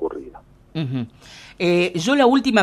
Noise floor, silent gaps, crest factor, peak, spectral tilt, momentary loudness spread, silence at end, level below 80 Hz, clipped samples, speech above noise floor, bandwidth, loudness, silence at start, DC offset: -44 dBFS; none; 16 dB; -4 dBFS; -5.5 dB/octave; 18 LU; 0 s; -54 dBFS; under 0.1%; 25 dB; 13 kHz; -19 LUFS; 0 s; under 0.1%